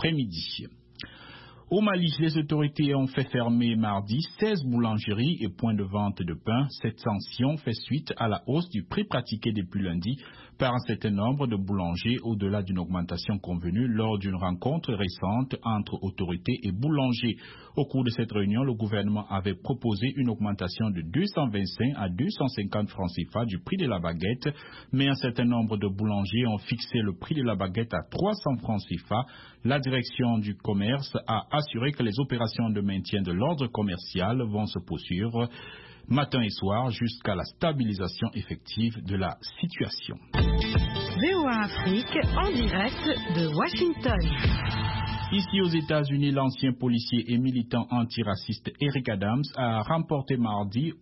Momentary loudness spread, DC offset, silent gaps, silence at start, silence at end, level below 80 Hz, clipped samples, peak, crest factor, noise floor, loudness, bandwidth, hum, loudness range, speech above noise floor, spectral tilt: 6 LU; under 0.1%; none; 0 s; 0.05 s; -42 dBFS; under 0.1%; -12 dBFS; 16 dB; -49 dBFS; -28 LUFS; 5.8 kHz; none; 3 LU; 21 dB; -10 dB/octave